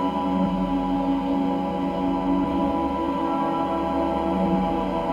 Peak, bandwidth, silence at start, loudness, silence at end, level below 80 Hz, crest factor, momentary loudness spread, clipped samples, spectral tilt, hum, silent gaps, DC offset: -12 dBFS; 9.2 kHz; 0 s; -24 LUFS; 0 s; -42 dBFS; 12 dB; 2 LU; under 0.1%; -8.5 dB/octave; none; none; under 0.1%